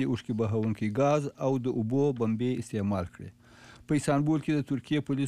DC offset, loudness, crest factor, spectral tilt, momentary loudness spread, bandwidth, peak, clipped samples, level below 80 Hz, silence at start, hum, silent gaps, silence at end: under 0.1%; -29 LUFS; 14 dB; -7.5 dB/octave; 5 LU; 13 kHz; -16 dBFS; under 0.1%; -60 dBFS; 0 s; none; none; 0 s